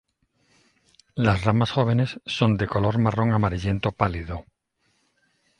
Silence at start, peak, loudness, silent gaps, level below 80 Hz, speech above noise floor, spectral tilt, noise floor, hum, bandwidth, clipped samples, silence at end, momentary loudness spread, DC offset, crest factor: 1.15 s; -4 dBFS; -23 LUFS; none; -42 dBFS; 48 dB; -7.5 dB/octave; -70 dBFS; none; 10 kHz; under 0.1%; 1.2 s; 8 LU; under 0.1%; 20 dB